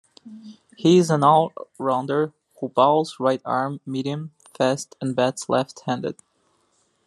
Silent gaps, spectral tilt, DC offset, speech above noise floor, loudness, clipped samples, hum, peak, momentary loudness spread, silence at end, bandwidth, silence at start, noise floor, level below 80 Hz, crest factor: none; -6 dB/octave; under 0.1%; 45 dB; -22 LUFS; under 0.1%; none; -4 dBFS; 14 LU; 0.95 s; 12.5 kHz; 0.25 s; -66 dBFS; -70 dBFS; 20 dB